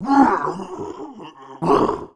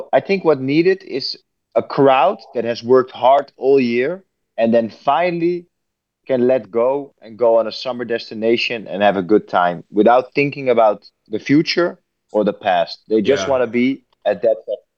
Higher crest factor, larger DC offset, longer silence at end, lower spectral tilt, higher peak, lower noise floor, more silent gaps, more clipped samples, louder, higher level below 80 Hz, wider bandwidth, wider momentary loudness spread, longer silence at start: about the same, 18 dB vs 18 dB; neither; about the same, 0.1 s vs 0.2 s; about the same, -7 dB/octave vs -6 dB/octave; about the same, -2 dBFS vs 0 dBFS; second, -39 dBFS vs -76 dBFS; neither; neither; about the same, -19 LUFS vs -17 LUFS; first, -50 dBFS vs -70 dBFS; first, 11 kHz vs 7 kHz; first, 22 LU vs 9 LU; about the same, 0 s vs 0 s